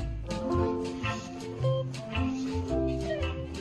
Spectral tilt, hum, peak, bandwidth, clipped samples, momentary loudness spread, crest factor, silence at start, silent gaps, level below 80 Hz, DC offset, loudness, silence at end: -6.5 dB/octave; none; -16 dBFS; 11.5 kHz; under 0.1%; 5 LU; 16 dB; 0 s; none; -40 dBFS; under 0.1%; -32 LUFS; 0 s